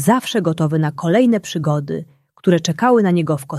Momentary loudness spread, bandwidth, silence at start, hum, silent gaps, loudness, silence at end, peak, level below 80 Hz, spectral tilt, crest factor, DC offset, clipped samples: 7 LU; 14 kHz; 0 s; none; none; -17 LUFS; 0 s; -2 dBFS; -58 dBFS; -6 dB/octave; 14 dB; under 0.1%; under 0.1%